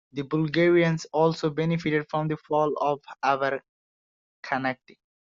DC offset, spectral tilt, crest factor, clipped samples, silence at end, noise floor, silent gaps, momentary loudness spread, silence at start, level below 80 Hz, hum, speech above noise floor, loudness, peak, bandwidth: under 0.1%; -5.5 dB/octave; 18 dB; under 0.1%; 0.55 s; under -90 dBFS; 3.69-4.43 s; 10 LU; 0.15 s; -66 dBFS; none; over 65 dB; -26 LUFS; -8 dBFS; 7.6 kHz